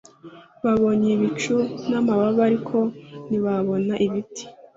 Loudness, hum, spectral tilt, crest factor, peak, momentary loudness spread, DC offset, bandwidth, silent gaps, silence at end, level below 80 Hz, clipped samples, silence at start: -22 LUFS; none; -6.5 dB/octave; 14 dB; -8 dBFS; 9 LU; under 0.1%; 7.8 kHz; none; 0.25 s; -58 dBFS; under 0.1%; 0.25 s